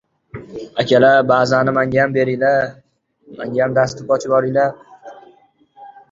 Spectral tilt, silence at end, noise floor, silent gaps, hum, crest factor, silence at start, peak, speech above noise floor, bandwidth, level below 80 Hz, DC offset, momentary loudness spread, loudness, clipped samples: -6 dB/octave; 0.2 s; -52 dBFS; none; none; 16 dB; 0.35 s; 0 dBFS; 37 dB; 7.8 kHz; -54 dBFS; under 0.1%; 18 LU; -16 LUFS; under 0.1%